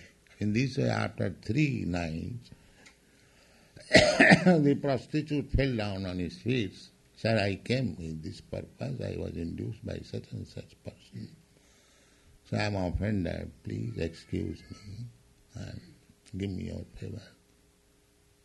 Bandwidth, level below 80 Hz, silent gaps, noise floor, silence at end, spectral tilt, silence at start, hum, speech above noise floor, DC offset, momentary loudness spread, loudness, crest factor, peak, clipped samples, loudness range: 12 kHz; -48 dBFS; none; -65 dBFS; 1.15 s; -5.5 dB/octave; 0 s; none; 35 dB; under 0.1%; 22 LU; -29 LUFS; 28 dB; -4 dBFS; under 0.1%; 16 LU